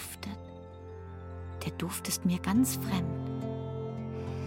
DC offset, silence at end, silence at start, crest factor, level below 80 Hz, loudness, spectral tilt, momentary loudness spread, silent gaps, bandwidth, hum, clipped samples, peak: under 0.1%; 0 s; 0 s; 16 dB; -56 dBFS; -33 LUFS; -5 dB/octave; 17 LU; none; 17 kHz; none; under 0.1%; -18 dBFS